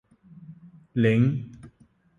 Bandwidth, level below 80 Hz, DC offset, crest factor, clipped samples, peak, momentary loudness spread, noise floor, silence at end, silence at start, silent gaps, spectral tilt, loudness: 9.6 kHz; -62 dBFS; under 0.1%; 18 dB; under 0.1%; -8 dBFS; 23 LU; -59 dBFS; 0.5 s; 0.5 s; none; -9 dB/octave; -24 LUFS